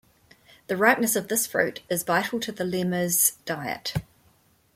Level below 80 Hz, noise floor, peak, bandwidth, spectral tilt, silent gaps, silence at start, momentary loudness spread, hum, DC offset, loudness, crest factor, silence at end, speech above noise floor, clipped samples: -58 dBFS; -62 dBFS; -4 dBFS; 16.5 kHz; -3 dB/octave; none; 0.7 s; 11 LU; none; under 0.1%; -24 LUFS; 22 dB; 0.75 s; 37 dB; under 0.1%